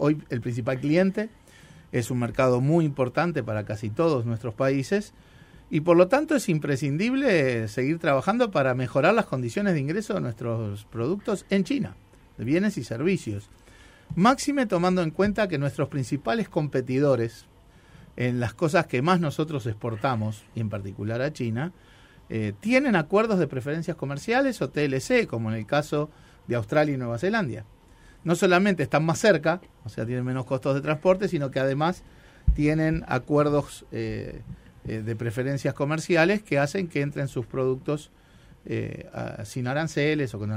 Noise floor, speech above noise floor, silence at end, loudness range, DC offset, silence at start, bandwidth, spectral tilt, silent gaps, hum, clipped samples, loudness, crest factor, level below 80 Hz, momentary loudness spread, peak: -52 dBFS; 27 dB; 0 s; 4 LU; under 0.1%; 0 s; 15.5 kHz; -6.5 dB/octave; none; none; under 0.1%; -25 LUFS; 20 dB; -46 dBFS; 11 LU; -4 dBFS